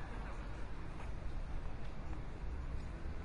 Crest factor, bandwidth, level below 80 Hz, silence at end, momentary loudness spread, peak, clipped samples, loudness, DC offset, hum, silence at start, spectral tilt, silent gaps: 12 dB; 10.5 kHz; -44 dBFS; 0 s; 2 LU; -30 dBFS; under 0.1%; -48 LUFS; under 0.1%; none; 0 s; -7 dB/octave; none